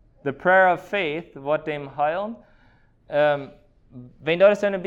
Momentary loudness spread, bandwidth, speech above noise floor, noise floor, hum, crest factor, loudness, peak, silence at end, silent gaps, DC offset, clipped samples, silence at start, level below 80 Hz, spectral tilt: 14 LU; 7.8 kHz; 35 dB; -57 dBFS; none; 18 dB; -22 LUFS; -6 dBFS; 0 s; none; under 0.1%; under 0.1%; 0.25 s; -60 dBFS; -6 dB/octave